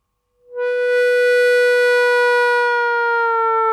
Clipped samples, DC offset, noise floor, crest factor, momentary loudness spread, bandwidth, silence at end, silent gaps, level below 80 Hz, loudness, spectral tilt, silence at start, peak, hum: under 0.1%; under 0.1%; -57 dBFS; 8 dB; 6 LU; 13 kHz; 0 s; none; -74 dBFS; -15 LUFS; 1.5 dB/octave; 0.5 s; -8 dBFS; none